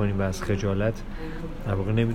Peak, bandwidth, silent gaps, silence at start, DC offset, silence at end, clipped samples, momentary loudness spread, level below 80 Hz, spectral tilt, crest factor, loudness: -10 dBFS; 14 kHz; none; 0 s; under 0.1%; 0 s; under 0.1%; 11 LU; -36 dBFS; -7 dB/octave; 16 dB; -28 LUFS